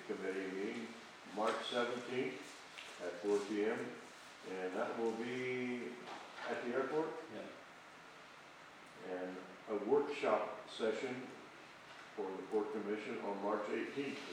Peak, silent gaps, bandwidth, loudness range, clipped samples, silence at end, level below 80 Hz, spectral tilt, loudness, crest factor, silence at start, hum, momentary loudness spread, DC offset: -20 dBFS; none; 14.5 kHz; 4 LU; under 0.1%; 0 s; -88 dBFS; -4.5 dB/octave; -41 LUFS; 22 dB; 0 s; none; 18 LU; under 0.1%